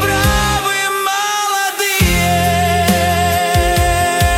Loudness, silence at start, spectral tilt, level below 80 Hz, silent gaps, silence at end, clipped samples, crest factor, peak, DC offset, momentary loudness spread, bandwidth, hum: -14 LUFS; 0 s; -3.5 dB/octave; -24 dBFS; none; 0 s; under 0.1%; 12 dB; -2 dBFS; under 0.1%; 3 LU; 18 kHz; none